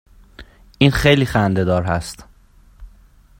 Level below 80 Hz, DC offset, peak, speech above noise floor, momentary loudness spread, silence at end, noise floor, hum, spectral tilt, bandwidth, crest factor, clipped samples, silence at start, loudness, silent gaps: -36 dBFS; under 0.1%; 0 dBFS; 33 dB; 14 LU; 0.5 s; -49 dBFS; none; -6 dB/octave; 16.5 kHz; 20 dB; under 0.1%; 0.4 s; -17 LUFS; none